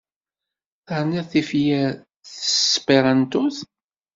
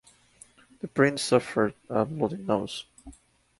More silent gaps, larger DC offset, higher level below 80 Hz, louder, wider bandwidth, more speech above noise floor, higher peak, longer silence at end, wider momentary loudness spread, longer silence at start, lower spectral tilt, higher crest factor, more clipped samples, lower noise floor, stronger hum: neither; neither; about the same, -62 dBFS vs -60 dBFS; first, -20 LUFS vs -27 LUFS; second, 7.8 kHz vs 11.5 kHz; first, 67 dB vs 30 dB; first, -2 dBFS vs -6 dBFS; about the same, 0.5 s vs 0.5 s; about the same, 13 LU vs 14 LU; about the same, 0.9 s vs 0.85 s; about the same, -4 dB/octave vs -5 dB/octave; about the same, 20 dB vs 22 dB; neither; first, -87 dBFS vs -56 dBFS; neither